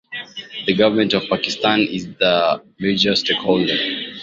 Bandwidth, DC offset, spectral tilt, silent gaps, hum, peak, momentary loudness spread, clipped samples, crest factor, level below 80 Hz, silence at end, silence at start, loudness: 7.6 kHz; under 0.1%; -4.5 dB/octave; none; none; 0 dBFS; 8 LU; under 0.1%; 18 dB; -56 dBFS; 0 s; 0.1 s; -18 LUFS